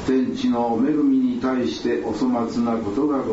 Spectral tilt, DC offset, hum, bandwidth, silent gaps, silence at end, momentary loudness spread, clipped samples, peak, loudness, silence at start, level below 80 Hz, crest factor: -6.5 dB/octave; under 0.1%; none; 8 kHz; none; 0 s; 4 LU; under 0.1%; -10 dBFS; -21 LUFS; 0 s; -50 dBFS; 10 dB